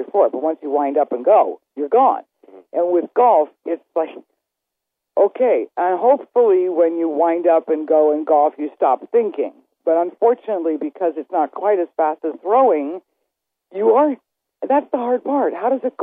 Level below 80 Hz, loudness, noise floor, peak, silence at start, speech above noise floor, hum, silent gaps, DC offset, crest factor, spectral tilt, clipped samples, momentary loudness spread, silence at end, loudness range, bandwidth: -82 dBFS; -18 LUFS; -81 dBFS; -4 dBFS; 0 s; 64 dB; none; none; under 0.1%; 14 dB; -9 dB/octave; under 0.1%; 10 LU; 0 s; 4 LU; 3.7 kHz